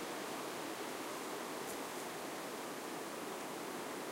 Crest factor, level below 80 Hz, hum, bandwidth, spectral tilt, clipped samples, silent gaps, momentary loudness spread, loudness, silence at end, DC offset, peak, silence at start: 12 dB; -82 dBFS; none; 16 kHz; -2.5 dB/octave; under 0.1%; none; 1 LU; -44 LUFS; 0 s; under 0.1%; -32 dBFS; 0 s